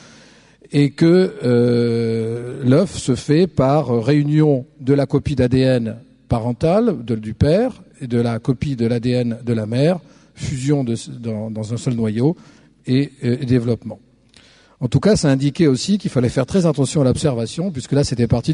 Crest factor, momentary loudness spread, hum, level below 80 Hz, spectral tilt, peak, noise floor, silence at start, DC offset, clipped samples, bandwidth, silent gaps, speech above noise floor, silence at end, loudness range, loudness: 16 dB; 10 LU; none; -42 dBFS; -7 dB/octave; -2 dBFS; -50 dBFS; 0.7 s; under 0.1%; under 0.1%; 11 kHz; none; 33 dB; 0 s; 5 LU; -18 LUFS